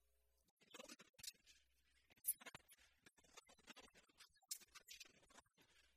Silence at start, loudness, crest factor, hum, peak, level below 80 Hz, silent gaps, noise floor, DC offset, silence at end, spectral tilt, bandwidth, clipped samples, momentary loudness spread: 0.6 s; -54 LUFS; 32 dB; none; -28 dBFS; -88 dBFS; none; -84 dBFS; under 0.1%; 0.1 s; 0 dB/octave; 15.5 kHz; under 0.1%; 22 LU